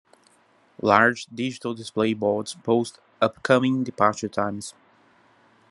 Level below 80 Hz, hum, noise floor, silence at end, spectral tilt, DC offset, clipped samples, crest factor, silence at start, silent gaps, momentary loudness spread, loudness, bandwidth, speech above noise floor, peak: -68 dBFS; none; -60 dBFS; 1 s; -5 dB/octave; under 0.1%; under 0.1%; 24 dB; 0.85 s; none; 12 LU; -23 LUFS; 11.5 kHz; 37 dB; 0 dBFS